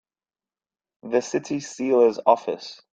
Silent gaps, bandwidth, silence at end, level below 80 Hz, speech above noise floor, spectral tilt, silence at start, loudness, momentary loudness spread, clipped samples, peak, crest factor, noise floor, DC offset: none; 8.8 kHz; 0.2 s; -72 dBFS; over 68 dB; -4.5 dB/octave; 1.05 s; -22 LUFS; 13 LU; under 0.1%; -2 dBFS; 22 dB; under -90 dBFS; under 0.1%